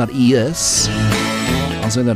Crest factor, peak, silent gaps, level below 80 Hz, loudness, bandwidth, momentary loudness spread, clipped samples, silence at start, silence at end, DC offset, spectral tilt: 12 dB; -4 dBFS; none; -34 dBFS; -16 LUFS; 16 kHz; 4 LU; under 0.1%; 0 s; 0 s; under 0.1%; -4 dB/octave